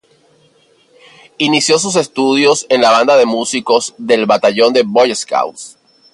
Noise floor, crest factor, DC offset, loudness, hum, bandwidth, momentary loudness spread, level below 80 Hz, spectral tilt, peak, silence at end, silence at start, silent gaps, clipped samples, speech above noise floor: -52 dBFS; 14 dB; under 0.1%; -12 LUFS; none; 11.5 kHz; 8 LU; -62 dBFS; -3 dB/octave; 0 dBFS; 0.45 s; 1.4 s; none; under 0.1%; 40 dB